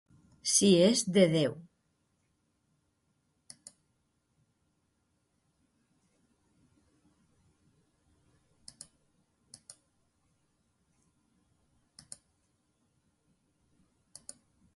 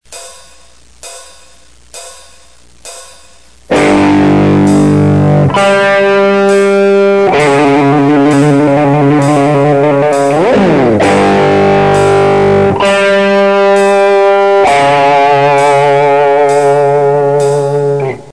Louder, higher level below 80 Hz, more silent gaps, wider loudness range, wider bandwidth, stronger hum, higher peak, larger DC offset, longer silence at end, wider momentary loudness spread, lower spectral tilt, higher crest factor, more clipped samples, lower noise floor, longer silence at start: second, -26 LUFS vs -8 LUFS; second, -74 dBFS vs -40 dBFS; neither; first, 30 LU vs 3 LU; about the same, 11.5 kHz vs 11 kHz; neither; second, -10 dBFS vs 0 dBFS; second, under 0.1% vs 1%; first, 13.15 s vs 0 s; first, 27 LU vs 4 LU; second, -4 dB/octave vs -6.5 dB/octave; first, 26 dB vs 8 dB; neither; first, -77 dBFS vs -42 dBFS; first, 0.45 s vs 0.1 s